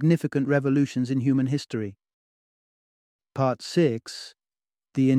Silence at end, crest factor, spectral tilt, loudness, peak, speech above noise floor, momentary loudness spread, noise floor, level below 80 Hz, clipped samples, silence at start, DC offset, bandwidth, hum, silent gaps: 0 s; 16 dB; -7 dB/octave; -25 LUFS; -8 dBFS; over 66 dB; 15 LU; under -90 dBFS; -68 dBFS; under 0.1%; 0 s; under 0.1%; 12 kHz; none; 2.13-3.19 s